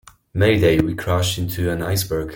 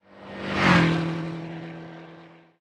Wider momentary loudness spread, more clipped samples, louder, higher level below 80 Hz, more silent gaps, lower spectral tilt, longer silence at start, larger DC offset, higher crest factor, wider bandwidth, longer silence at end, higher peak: second, 7 LU vs 23 LU; neither; first, -19 LUFS vs -23 LUFS; first, -40 dBFS vs -52 dBFS; neither; about the same, -5.5 dB/octave vs -6 dB/octave; first, 0.35 s vs 0.15 s; neither; about the same, 16 dB vs 20 dB; first, 17 kHz vs 9.8 kHz; second, 0 s vs 0.3 s; first, -2 dBFS vs -6 dBFS